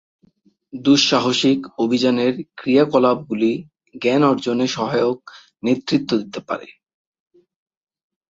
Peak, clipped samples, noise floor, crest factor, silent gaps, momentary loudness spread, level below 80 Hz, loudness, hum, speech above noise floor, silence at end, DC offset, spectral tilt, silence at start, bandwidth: -2 dBFS; under 0.1%; -59 dBFS; 18 dB; none; 13 LU; -62 dBFS; -19 LUFS; none; 40 dB; 1.6 s; under 0.1%; -5 dB/octave; 0.75 s; 7.8 kHz